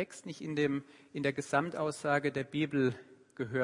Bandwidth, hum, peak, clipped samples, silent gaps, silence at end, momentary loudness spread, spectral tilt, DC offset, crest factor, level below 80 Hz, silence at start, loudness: 11 kHz; none; -16 dBFS; under 0.1%; none; 0 s; 11 LU; -6 dB/octave; under 0.1%; 18 dB; -74 dBFS; 0 s; -34 LUFS